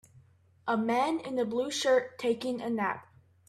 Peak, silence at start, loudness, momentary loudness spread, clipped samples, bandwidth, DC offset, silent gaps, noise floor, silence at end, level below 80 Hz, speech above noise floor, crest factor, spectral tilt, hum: -14 dBFS; 0.65 s; -30 LUFS; 6 LU; under 0.1%; 14 kHz; under 0.1%; none; -61 dBFS; 0.45 s; -76 dBFS; 31 dB; 16 dB; -4 dB/octave; none